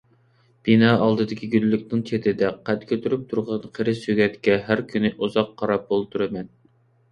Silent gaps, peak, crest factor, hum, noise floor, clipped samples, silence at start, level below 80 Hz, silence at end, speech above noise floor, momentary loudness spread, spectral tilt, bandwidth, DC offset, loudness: none; -4 dBFS; 20 dB; none; -60 dBFS; under 0.1%; 0.65 s; -58 dBFS; 0.65 s; 38 dB; 9 LU; -7.5 dB/octave; 9 kHz; under 0.1%; -22 LUFS